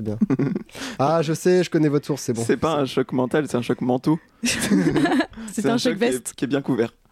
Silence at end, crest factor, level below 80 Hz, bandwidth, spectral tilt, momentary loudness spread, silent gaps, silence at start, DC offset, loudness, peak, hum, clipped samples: 0.25 s; 12 dB; -54 dBFS; 16 kHz; -5.5 dB/octave; 6 LU; none; 0 s; under 0.1%; -22 LUFS; -8 dBFS; none; under 0.1%